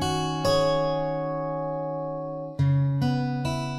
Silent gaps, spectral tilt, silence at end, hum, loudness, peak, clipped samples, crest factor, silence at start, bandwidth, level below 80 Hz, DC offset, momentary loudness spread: none; -6.5 dB/octave; 0 s; none; -26 LUFS; -12 dBFS; under 0.1%; 14 dB; 0 s; 13.5 kHz; -48 dBFS; under 0.1%; 8 LU